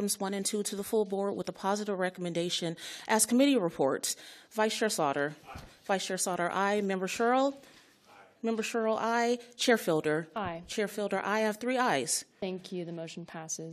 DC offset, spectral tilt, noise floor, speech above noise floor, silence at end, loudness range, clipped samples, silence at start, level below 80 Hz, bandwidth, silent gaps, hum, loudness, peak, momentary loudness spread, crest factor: under 0.1%; -3.5 dB/octave; -58 dBFS; 27 dB; 0 s; 3 LU; under 0.1%; 0 s; -70 dBFS; 14 kHz; none; none; -31 LUFS; -12 dBFS; 11 LU; 20 dB